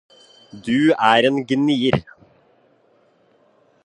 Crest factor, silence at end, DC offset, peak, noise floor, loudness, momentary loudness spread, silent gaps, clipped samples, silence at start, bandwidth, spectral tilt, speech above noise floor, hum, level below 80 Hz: 20 dB; 1.85 s; under 0.1%; 0 dBFS; -58 dBFS; -17 LUFS; 9 LU; none; under 0.1%; 0.55 s; 10 kHz; -6 dB/octave; 41 dB; none; -54 dBFS